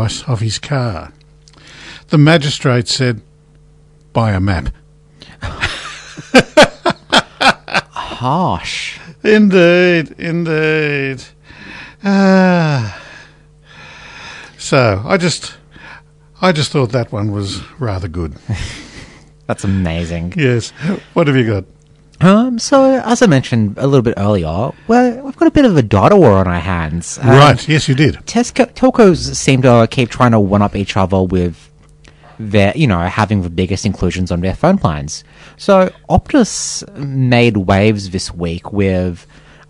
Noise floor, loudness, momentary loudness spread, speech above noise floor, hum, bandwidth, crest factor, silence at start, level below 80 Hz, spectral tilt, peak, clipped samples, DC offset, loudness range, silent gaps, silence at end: -45 dBFS; -13 LUFS; 15 LU; 33 dB; none; 12 kHz; 14 dB; 0 s; -36 dBFS; -5.5 dB/octave; 0 dBFS; 0.6%; under 0.1%; 8 LU; none; 0.5 s